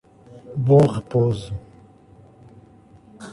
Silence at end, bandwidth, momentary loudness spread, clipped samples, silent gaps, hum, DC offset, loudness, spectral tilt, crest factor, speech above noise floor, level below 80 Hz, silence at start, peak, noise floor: 0 s; 11 kHz; 20 LU; under 0.1%; none; none; under 0.1%; -19 LUFS; -9 dB/octave; 20 dB; 31 dB; -50 dBFS; 0.35 s; -4 dBFS; -49 dBFS